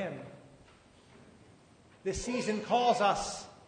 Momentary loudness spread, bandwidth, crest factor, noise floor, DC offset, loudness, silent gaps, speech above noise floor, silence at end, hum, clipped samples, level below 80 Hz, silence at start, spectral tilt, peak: 15 LU; 9.6 kHz; 20 dB; -60 dBFS; under 0.1%; -31 LUFS; none; 30 dB; 0.1 s; none; under 0.1%; -56 dBFS; 0 s; -4 dB/octave; -14 dBFS